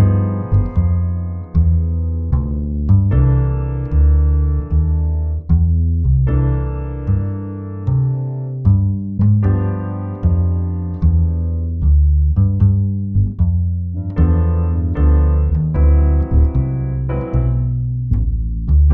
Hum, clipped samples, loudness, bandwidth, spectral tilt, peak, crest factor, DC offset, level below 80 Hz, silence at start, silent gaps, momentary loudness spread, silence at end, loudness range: none; under 0.1%; -17 LUFS; 2.8 kHz; -13.5 dB/octave; -2 dBFS; 14 dB; under 0.1%; -18 dBFS; 0 s; none; 7 LU; 0 s; 2 LU